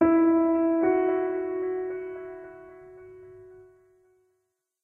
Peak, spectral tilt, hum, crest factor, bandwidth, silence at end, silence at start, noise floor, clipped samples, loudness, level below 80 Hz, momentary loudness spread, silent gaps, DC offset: -10 dBFS; -10 dB/octave; none; 18 dB; 3.2 kHz; 1.2 s; 0 s; -78 dBFS; under 0.1%; -25 LUFS; -62 dBFS; 26 LU; none; under 0.1%